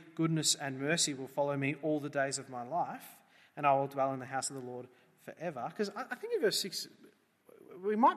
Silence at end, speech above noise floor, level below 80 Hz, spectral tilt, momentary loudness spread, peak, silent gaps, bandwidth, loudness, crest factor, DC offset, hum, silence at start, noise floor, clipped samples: 0 s; 29 dB; -84 dBFS; -3.5 dB/octave; 17 LU; -14 dBFS; none; 14.5 kHz; -34 LUFS; 20 dB; under 0.1%; none; 0 s; -63 dBFS; under 0.1%